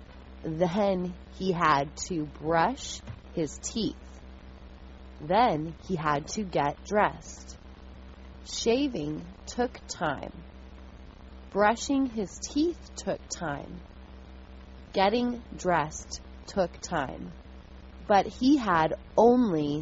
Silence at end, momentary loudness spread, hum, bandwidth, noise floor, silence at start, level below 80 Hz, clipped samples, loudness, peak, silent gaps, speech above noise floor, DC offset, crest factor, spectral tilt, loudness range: 0 s; 24 LU; none; 8 kHz; -47 dBFS; 0 s; -48 dBFS; under 0.1%; -28 LUFS; -8 dBFS; none; 19 dB; under 0.1%; 20 dB; -4.5 dB/octave; 4 LU